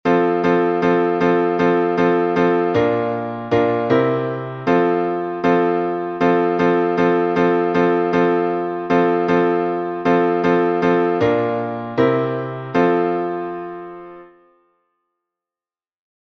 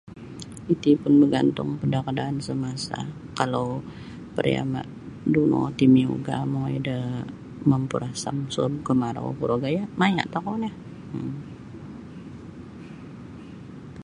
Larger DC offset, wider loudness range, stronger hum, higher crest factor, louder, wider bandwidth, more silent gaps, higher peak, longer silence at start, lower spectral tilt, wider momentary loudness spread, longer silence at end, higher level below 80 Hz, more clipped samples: neither; about the same, 5 LU vs 6 LU; neither; second, 16 dB vs 22 dB; first, -18 LUFS vs -25 LUFS; second, 6.2 kHz vs 11 kHz; neither; about the same, -2 dBFS vs -4 dBFS; about the same, 0.05 s vs 0.05 s; about the same, -8 dB/octave vs -7 dB/octave; second, 7 LU vs 21 LU; first, 2.05 s vs 0 s; about the same, -56 dBFS vs -54 dBFS; neither